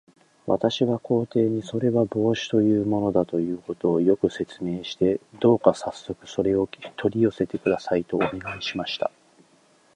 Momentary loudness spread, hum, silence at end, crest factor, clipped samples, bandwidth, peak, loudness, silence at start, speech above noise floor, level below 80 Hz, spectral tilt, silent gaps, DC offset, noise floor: 9 LU; none; 0.85 s; 22 dB; under 0.1%; 10 kHz; -2 dBFS; -24 LUFS; 0.45 s; 36 dB; -56 dBFS; -6.5 dB/octave; none; under 0.1%; -59 dBFS